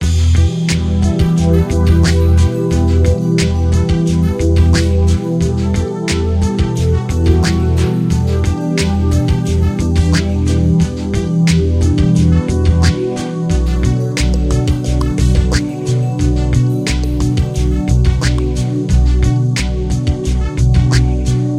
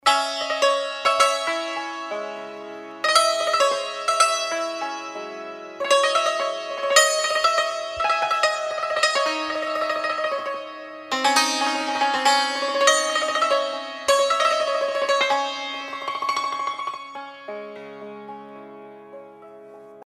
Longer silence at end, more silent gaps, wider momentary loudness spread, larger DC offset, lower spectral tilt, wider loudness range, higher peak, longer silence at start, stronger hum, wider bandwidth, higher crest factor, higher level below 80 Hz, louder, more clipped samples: about the same, 0 s vs 0 s; neither; second, 5 LU vs 18 LU; neither; first, -6.5 dB/octave vs 0.5 dB/octave; second, 2 LU vs 8 LU; about the same, 0 dBFS vs 0 dBFS; about the same, 0 s vs 0.05 s; neither; second, 12 kHz vs 15.5 kHz; second, 12 dB vs 22 dB; first, -20 dBFS vs -68 dBFS; first, -14 LUFS vs -21 LUFS; neither